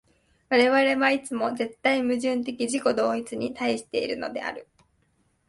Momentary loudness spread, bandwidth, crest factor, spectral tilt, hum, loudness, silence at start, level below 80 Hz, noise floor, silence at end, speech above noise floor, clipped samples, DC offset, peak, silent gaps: 11 LU; 11.5 kHz; 18 dB; -3.5 dB/octave; none; -25 LUFS; 0.5 s; -66 dBFS; -68 dBFS; 0.85 s; 43 dB; under 0.1%; under 0.1%; -8 dBFS; none